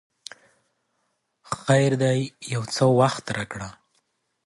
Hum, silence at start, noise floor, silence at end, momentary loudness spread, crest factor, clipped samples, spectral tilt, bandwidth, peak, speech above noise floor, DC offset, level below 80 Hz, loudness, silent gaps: none; 1.5 s; -74 dBFS; 0.75 s; 21 LU; 20 dB; under 0.1%; -5.5 dB/octave; 11.5 kHz; -6 dBFS; 52 dB; under 0.1%; -60 dBFS; -23 LUFS; none